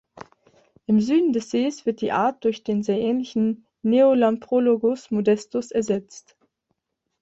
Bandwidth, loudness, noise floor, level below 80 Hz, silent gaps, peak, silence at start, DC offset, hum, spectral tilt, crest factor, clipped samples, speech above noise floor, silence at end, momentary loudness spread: 8 kHz; -22 LUFS; -76 dBFS; -64 dBFS; none; -8 dBFS; 0.2 s; under 0.1%; none; -6.5 dB/octave; 16 dB; under 0.1%; 55 dB; 1 s; 8 LU